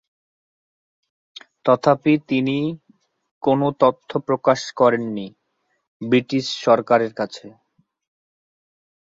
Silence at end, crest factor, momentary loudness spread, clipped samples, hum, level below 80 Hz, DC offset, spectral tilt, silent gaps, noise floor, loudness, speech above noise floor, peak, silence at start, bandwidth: 1.6 s; 20 dB; 12 LU; under 0.1%; none; -66 dBFS; under 0.1%; -6 dB/octave; 3.31-3.41 s, 5.88-6.00 s; -71 dBFS; -20 LUFS; 52 dB; -2 dBFS; 1.65 s; 7.8 kHz